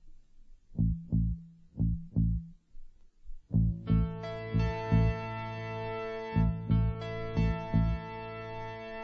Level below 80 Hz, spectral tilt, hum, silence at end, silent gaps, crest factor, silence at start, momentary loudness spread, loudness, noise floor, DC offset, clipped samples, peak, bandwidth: -38 dBFS; -9.5 dB/octave; none; 0 s; none; 18 dB; 0.05 s; 12 LU; -33 LUFS; -54 dBFS; under 0.1%; under 0.1%; -14 dBFS; 6.6 kHz